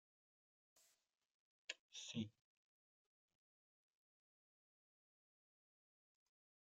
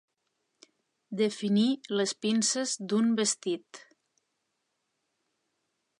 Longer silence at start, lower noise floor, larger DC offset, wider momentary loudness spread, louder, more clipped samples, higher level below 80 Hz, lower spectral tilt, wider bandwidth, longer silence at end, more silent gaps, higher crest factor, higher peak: second, 0.75 s vs 1.1 s; first, under -90 dBFS vs -80 dBFS; neither; about the same, 6 LU vs 7 LU; second, -52 LUFS vs -28 LUFS; neither; second, under -90 dBFS vs -82 dBFS; about the same, -3.5 dB/octave vs -3.5 dB/octave; about the same, 10 kHz vs 11 kHz; first, 4.4 s vs 2.2 s; first, 1.31-1.68 s, 1.79-1.89 s vs none; first, 28 dB vs 18 dB; second, -32 dBFS vs -14 dBFS